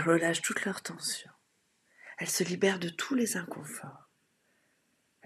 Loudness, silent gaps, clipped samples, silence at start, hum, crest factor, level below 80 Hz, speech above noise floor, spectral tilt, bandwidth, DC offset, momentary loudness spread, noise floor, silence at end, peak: -32 LUFS; none; under 0.1%; 0 s; none; 22 dB; -82 dBFS; 42 dB; -3.5 dB/octave; 14.5 kHz; under 0.1%; 15 LU; -74 dBFS; 1.3 s; -12 dBFS